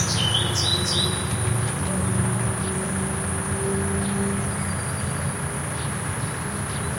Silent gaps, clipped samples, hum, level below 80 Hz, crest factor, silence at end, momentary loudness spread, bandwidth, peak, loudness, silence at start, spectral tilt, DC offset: none; under 0.1%; none; -44 dBFS; 16 dB; 0 s; 7 LU; 16.5 kHz; -8 dBFS; -24 LUFS; 0 s; -3.5 dB/octave; under 0.1%